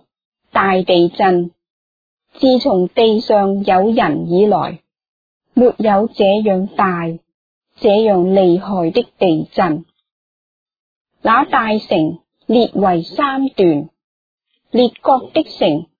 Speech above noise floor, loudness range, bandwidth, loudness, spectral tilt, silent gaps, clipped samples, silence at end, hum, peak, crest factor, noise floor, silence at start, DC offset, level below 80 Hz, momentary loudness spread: over 76 dB; 3 LU; 5 kHz; -15 LUFS; -8.5 dB/octave; 1.70-2.17 s, 5.08-5.40 s, 7.34-7.61 s, 10.12-10.66 s, 10.79-11.05 s, 14.04-14.38 s; under 0.1%; 0.15 s; none; 0 dBFS; 14 dB; under -90 dBFS; 0.55 s; under 0.1%; -52 dBFS; 8 LU